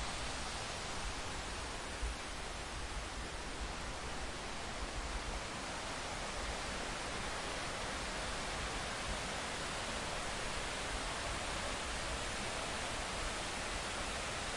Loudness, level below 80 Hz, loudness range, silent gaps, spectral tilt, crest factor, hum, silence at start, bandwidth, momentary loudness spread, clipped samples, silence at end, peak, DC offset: -41 LUFS; -48 dBFS; 3 LU; none; -2.5 dB/octave; 14 dB; none; 0 s; 11.5 kHz; 4 LU; under 0.1%; 0 s; -26 dBFS; under 0.1%